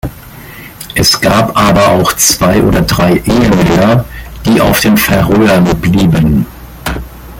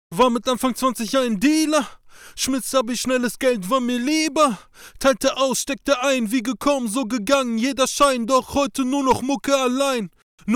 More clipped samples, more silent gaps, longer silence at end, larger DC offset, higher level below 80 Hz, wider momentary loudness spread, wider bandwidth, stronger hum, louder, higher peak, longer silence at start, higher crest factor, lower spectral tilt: neither; second, none vs 10.22-10.38 s; about the same, 0 s vs 0 s; neither; first, -26 dBFS vs -50 dBFS; first, 15 LU vs 5 LU; about the same, 17.5 kHz vs 18 kHz; neither; first, -8 LUFS vs -20 LUFS; first, 0 dBFS vs -6 dBFS; about the same, 0.05 s vs 0.1 s; second, 10 dB vs 16 dB; about the same, -4.5 dB/octave vs -3.5 dB/octave